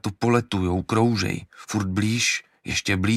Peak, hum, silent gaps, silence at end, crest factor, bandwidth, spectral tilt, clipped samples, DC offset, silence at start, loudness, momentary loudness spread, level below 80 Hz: -6 dBFS; none; none; 0 s; 18 dB; 14 kHz; -4.5 dB/octave; under 0.1%; under 0.1%; 0.05 s; -23 LUFS; 7 LU; -50 dBFS